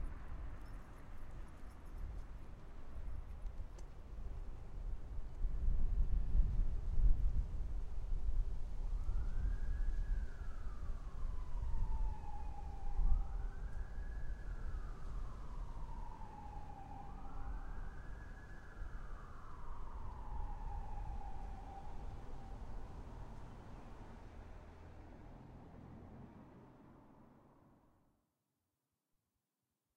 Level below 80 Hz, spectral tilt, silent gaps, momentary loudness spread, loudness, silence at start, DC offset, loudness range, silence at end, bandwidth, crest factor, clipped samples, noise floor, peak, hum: -42 dBFS; -7.5 dB/octave; none; 15 LU; -48 LUFS; 0 s; under 0.1%; 15 LU; 2.65 s; 3.9 kHz; 20 dB; under 0.1%; under -90 dBFS; -20 dBFS; none